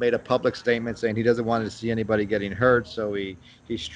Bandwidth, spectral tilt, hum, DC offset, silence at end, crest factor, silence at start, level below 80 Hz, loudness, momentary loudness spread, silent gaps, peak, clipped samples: 9.6 kHz; -6.5 dB/octave; none; under 0.1%; 0 s; 18 dB; 0 s; -52 dBFS; -25 LUFS; 10 LU; none; -6 dBFS; under 0.1%